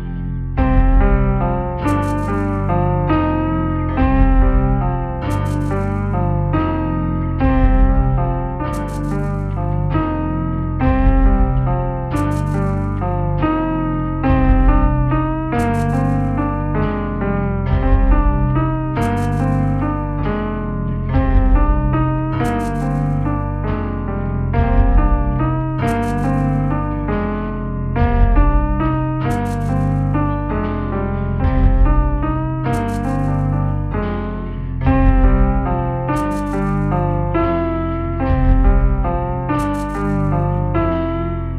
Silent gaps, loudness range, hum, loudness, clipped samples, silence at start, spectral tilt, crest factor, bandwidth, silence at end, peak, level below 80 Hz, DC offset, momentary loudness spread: none; 1 LU; none; -18 LUFS; under 0.1%; 0 s; -9 dB/octave; 16 dB; 9 kHz; 0 s; 0 dBFS; -20 dBFS; under 0.1%; 6 LU